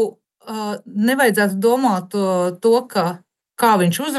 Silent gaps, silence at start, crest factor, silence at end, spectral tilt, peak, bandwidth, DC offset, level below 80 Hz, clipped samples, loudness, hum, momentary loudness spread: none; 0 s; 14 dB; 0 s; -5 dB/octave; -4 dBFS; 13 kHz; under 0.1%; -74 dBFS; under 0.1%; -18 LUFS; none; 11 LU